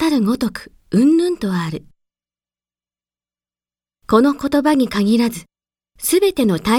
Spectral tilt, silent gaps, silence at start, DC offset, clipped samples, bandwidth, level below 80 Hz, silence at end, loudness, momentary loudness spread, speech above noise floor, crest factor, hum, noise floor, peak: -5.5 dB/octave; none; 0 s; under 0.1%; under 0.1%; 18 kHz; -50 dBFS; 0 s; -17 LUFS; 10 LU; over 74 dB; 18 dB; 60 Hz at -45 dBFS; under -90 dBFS; 0 dBFS